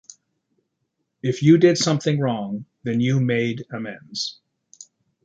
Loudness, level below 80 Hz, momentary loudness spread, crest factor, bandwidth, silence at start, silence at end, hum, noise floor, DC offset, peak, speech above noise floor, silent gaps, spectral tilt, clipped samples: -21 LUFS; -64 dBFS; 16 LU; 20 dB; 9.2 kHz; 1.25 s; 0.4 s; none; -76 dBFS; under 0.1%; -4 dBFS; 55 dB; none; -6 dB/octave; under 0.1%